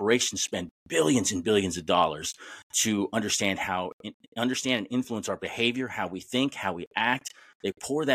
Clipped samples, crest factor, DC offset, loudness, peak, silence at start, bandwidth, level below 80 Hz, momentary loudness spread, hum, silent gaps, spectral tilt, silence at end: under 0.1%; 20 dB; under 0.1%; -28 LUFS; -8 dBFS; 0 s; 15.5 kHz; -64 dBFS; 11 LU; none; 0.71-0.86 s, 2.63-2.70 s, 3.93-3.99 s, 4.14-4.20 s, 4.28-4.32 s, 6.87-6.91 s, 7.55-7.60 s; -3 dB/octave; 0 s